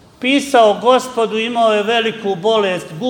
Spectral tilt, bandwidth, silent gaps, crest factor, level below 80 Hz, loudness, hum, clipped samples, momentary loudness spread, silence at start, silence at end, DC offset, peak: -4 dB/octave; 18 kHz; none; 14 dB; -58 dBFS; -15 LUFS; none; under 0.1%; 7 LU; 0.2 s; 0 s; under 0.1%; 0 dBFS